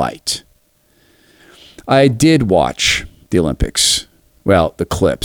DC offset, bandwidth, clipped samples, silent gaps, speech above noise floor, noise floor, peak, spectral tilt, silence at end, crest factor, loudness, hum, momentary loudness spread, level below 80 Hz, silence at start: under 0.1%; 19 kHz; under 0.1%; none; 42 dB; -56 dBFS; 0 dBFS; -4 dB/octave; 0 s; 16 dB; -15 LUFS; none; 10 LU; -32 dBFS; 0 s